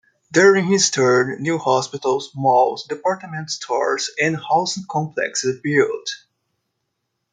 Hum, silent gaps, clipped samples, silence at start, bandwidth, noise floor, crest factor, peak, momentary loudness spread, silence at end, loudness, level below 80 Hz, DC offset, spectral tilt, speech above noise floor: none; none; under 0.1%; 0.3 s; 9.6 kHz; -76 dBFS; 18 dB; -2 dBFS; 10 LU; 1.15 s; -19 LUFS; -68 dBFS; under 0.1%; -3.5 dB/octave; 57 dB